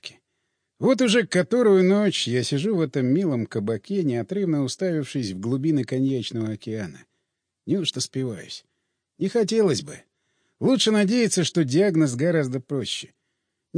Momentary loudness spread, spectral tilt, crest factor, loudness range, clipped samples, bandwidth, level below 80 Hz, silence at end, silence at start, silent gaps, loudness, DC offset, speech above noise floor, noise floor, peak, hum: 12 LU; -5.5 dB/octave; 16 dB; 6 LU; under 0.1%; 10.5 kHz; -68 dBFS; 0 s; 0 s; none; -23 LUFS; under 0.1%; 57 dB; -79 dBFS; -8 dBFS; none